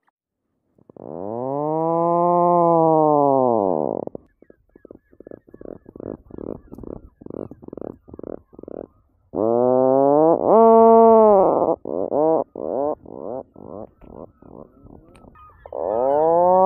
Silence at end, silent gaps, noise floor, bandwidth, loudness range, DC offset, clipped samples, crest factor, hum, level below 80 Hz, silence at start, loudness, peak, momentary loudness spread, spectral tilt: 0 s; none; -76 dBFS; 2.9 kHz; 22 LU; under 0.1%; under 0.1%; 18 dB; none; -54 dBFS; 1.05 s; -17 LUFS; -2 dBFS; 25 LU; -13 dB/octave